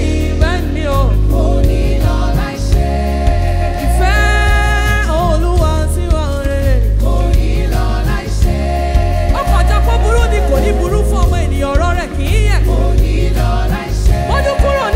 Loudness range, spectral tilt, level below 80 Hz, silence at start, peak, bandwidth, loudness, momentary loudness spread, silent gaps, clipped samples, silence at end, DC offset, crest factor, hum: 1 LU; -6 dB/octave; -14 dBFS; 0 s; -2 dBFS; 15.5 kHz; -14 LUFS; 3 LU; none; under 0.1%; 0 s; under 0.1%; 10 dB; none